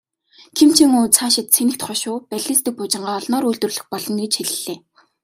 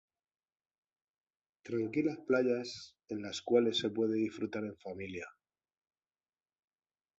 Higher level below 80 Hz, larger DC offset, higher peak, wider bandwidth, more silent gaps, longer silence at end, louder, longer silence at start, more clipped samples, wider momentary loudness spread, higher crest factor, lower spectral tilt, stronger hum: first, -62 dBFS vs -74 dBFS; neither; first, 0 dBFS vs -16 dBFS; first, 16 kHz vs 8 kHz; neither; second, 0.45 s vs 1.9 s; first, -17 LUFS vs -35 LUFS; second, 0.55 s vs 1.65 s; neither; about the same, 13 LU vs 14 LU; about the same, 18 dB vs 22 dB; second, -2.5 dB/octave vs -5 dB/octave; neither